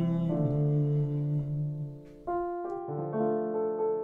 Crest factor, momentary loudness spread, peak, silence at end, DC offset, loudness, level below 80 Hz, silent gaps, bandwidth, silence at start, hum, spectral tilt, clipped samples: 12 dB; 8 LU; -18 dBFS; 0 s; under 0.1%; -31 LUFS; -58 dBFS; none; 3.7 kHz; 0 s; none; -12 dB/octave; under 0.1%